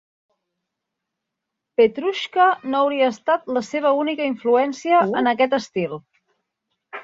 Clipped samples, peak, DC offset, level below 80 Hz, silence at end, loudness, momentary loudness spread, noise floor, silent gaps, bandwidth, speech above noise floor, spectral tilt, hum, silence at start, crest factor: under 0.1%; -4 dBFS; under 0.1%; -68 dBFS; 0 s; -20 LUFS; 9 LU; -82 dBFS; none; 7.8 kHz; 62 dB; -5 dB/octave; none; 1.8 s; 16 dB